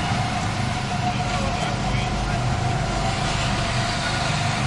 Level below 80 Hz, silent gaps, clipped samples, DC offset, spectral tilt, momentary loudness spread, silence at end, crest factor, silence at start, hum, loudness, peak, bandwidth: -34 dBFS; none; under 0.1%; under 0.1%; -4.5 dB/octave; 2 LU; 0 s; 12 dB; 0 s; none; -23 LUFS; -10 dBFS; 11.5 kHz